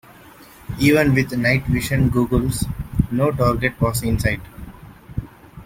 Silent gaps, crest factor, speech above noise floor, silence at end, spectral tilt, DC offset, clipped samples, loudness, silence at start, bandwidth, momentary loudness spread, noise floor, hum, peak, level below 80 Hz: none; 18 dB; 26 dB; 0 s; -6 dB/octave; under 0.1%; under 0.1%; -19 LUFS; 0.4 s; 16.5 kHz; 16 LU; -44 dBFS; none; -2 dBFS; -34 dBFS